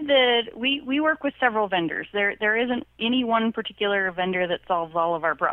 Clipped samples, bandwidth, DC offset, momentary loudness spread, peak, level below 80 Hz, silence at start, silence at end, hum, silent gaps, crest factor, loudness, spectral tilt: under 0.1%; 4.1 kHz; under 0.1%; 5 LU; -6 dBFS; -60 dBFS; 0 s; 0 s; none; none; 18 dB; -23 LUFS; -7 dB/octave